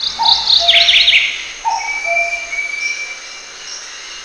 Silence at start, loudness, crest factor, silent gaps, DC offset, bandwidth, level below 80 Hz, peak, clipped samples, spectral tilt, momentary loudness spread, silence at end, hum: 0 s; -11 LUFS; 16 dB; none; under 0.1%; 11 kHz; -48 dBFS; 0 dBFS; under 0.1%; 2 dB/octave; 20 LU; 0 s; none